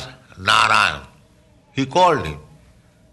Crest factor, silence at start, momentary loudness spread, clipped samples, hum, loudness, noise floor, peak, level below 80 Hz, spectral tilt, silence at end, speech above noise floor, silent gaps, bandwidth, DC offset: 18 dB; 0 s; 20 LU; under 0.1%; none; -17 LUFS; -53 dBFS; -4 dBFS; -48 dBFS; -3.5 dB/octave; 0.7 s; 36 dB; none; 12 kHz; under 0.1%